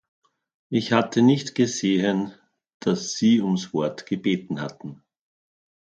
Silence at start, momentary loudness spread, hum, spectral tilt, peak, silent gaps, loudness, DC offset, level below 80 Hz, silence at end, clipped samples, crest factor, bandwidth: 0.7 s; 12 LU; none; -5.5 dB/octave; -2 dBFS; 2.74-2.80 s; -23 LUFS; under 0.1%; -66 dBFS; 1 s; under 0.1%; 22 dB; 8.8 kHz